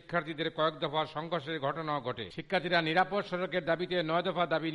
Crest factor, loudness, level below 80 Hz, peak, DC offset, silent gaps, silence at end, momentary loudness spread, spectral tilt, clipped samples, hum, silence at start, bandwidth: 18 dB; -32 LUFS; -66 dBFS; -14 dBFS; under 0.1%; none; 0 s; 7 LU; -6.5 dB/octave; under 0.1%; none; 0.1 s; 11 kHz